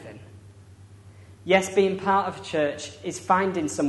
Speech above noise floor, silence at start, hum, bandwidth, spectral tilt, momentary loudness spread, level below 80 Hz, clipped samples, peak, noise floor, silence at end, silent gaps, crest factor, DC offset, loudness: 24 dB; 0 s; none; 11.5 kHz; -4.5 dB/octave; 16 LU; -62 dBFS; under 0.1%; -6 dBFS; -48 dBFS; 0 s; none; 20 dB; under 0.1%; -24 LUFS